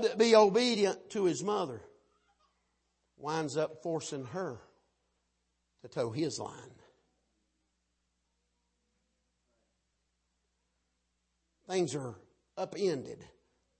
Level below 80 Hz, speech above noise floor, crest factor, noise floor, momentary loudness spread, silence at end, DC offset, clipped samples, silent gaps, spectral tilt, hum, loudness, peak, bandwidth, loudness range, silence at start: -78 dBFS; 49 dB; 24 dB; -80 dBFS; 21 LU; 0.55 s; under 0.1%; under 0.1%; none; -4.5 dB/octave; none; -32 LUFS; -10 dBFS; 8.4 kHz; 9 LU; 0 s